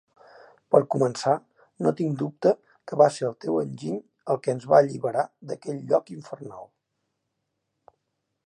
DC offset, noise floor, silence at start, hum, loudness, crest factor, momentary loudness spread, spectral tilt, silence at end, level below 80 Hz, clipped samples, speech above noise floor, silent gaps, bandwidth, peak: under 0.1%; -79 dBFS; 0.7 s; none; -25 LUFS; 22 dB; 15 LU; -6.5 dB/octave; 1.85 s; -76 dBFS; under 0.1%; 55 dB; none; 11 kHz; -4 dBFS